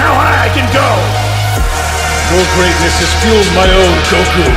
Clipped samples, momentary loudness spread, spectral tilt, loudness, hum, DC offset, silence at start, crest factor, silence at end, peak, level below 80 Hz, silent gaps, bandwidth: 0.2%; 5 LU; -4 dB/octave; -10 LUFS; none; under 0.1%; 0 s; 10 dB; 0 s; 0 dBFS; -18 dBFS; none; 16 kHz